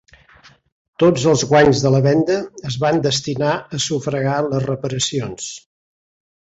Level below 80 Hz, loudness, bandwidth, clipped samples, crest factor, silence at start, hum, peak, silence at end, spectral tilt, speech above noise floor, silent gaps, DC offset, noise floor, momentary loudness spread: -50 dBFS; -17 LUFS; 8.2 kHz; under 0.1%; 16 dB; 1 s; none; -2 dBFS; 0.9 s; -5 dB/octave; 32 dB; none; under 0.1%; -49 dBFS; 12 LU